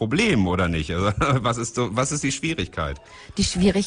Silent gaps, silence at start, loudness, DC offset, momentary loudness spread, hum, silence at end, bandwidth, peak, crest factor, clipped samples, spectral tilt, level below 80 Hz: none; 0 s; -23 LUFS; under 0.1%; 9 LU; none; 0 s; 10.5 kHz; -6 dBFS; 16 dB; under 0.1%; -5 dB/octave; -38 dBFS